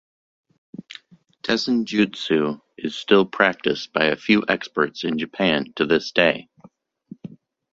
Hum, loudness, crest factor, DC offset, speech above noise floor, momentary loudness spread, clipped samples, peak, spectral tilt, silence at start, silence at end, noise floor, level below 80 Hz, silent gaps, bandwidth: none; -21 LUFS; 22 dB; under 0.1%; 32 dB; 22 LU; under 0.1%; 0 dBFS; -5 dB/octave; 0.9 s; 0.35 s; -53 dBFS; -60 dBFS; none; 7.8 kHz